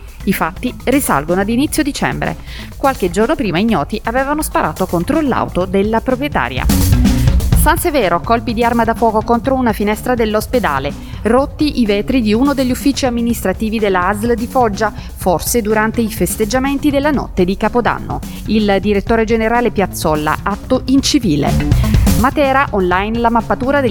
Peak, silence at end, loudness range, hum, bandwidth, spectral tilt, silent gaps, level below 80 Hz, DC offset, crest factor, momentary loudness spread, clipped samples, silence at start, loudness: 0 dBFS; 0 s; 2 LU; none; 19 kHz; -5.5 dB/octave; none; -24 dBFS; under 0.1%; 14 dB; 5 LU; under 0.1%; 0 s; -15 LUFS